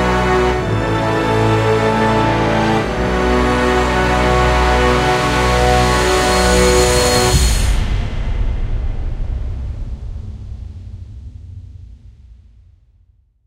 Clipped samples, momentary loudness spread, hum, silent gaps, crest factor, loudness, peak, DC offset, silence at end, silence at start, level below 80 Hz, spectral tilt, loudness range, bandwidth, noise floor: under 0.1%; 19 LU; none; none; 14 dB; -15 LUFS; 0 dBFS; under 0.1%; 1.15 s; 0 s; -22 dBFS; -4.5 dB/octave; 17 LU; 16 kHz; -53 dBFS